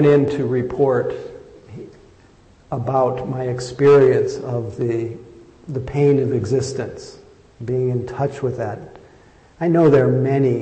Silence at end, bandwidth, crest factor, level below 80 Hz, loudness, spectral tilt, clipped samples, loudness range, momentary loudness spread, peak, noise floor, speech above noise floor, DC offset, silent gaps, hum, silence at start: 0 s; 8.6 kHz; 14 dB; -50 dBFS; -19 LUFS; -8 dB/octave; under 0.1%; 5 LU; 20 LU; -6 dBFS; -50 dBFS; 32 dB; under 0.1%; none; none; 0 s